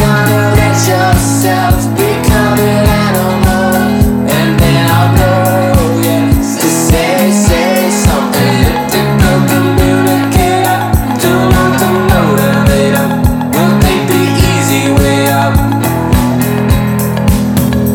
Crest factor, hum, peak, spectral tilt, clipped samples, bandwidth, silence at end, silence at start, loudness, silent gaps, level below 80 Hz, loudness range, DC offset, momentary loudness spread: 8 dB; none; 0 dBFS; -5.5 dB/octave; under 0.1%; 19 kHz; 0 s; 0 s; -10 LUFS; none; -20 dBFS; 1 LU; under 0.1%; 2 LU